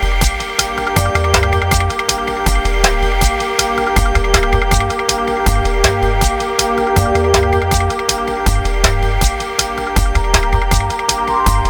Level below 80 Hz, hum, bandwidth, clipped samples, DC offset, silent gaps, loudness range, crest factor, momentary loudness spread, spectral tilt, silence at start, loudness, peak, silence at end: -18 dBFS; none; over 20 kHz; under 0.1%; under 0.1%; none; 1 LU; 14 dB; 3 LU; -4 dB/octave; 0 s; -15 LUFS; 0 dBFS; 0 s